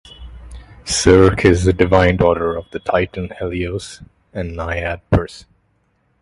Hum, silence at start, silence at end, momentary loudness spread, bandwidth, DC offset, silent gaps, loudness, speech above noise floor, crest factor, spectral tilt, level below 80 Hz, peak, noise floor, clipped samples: none; 0.2 s; 0.8 s; 18 LU; 11.5 kHz; under 0.1%; none; -16 LUFS; 47 dB; 18 dB; -5.5 dB/octave; -30 dBFS; 0 dBFS; -62 dBFS; under 0.1%